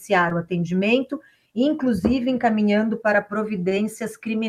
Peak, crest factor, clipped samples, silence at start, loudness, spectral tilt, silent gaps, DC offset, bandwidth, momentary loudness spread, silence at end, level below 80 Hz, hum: -4 dBFS; 16 dB; under 0.1%; 0 s; -22 LUFS; -6.5 dB/octave; none; under 0.1%; 14 kHz; 8 LU; 0 s; -50 dBFS; none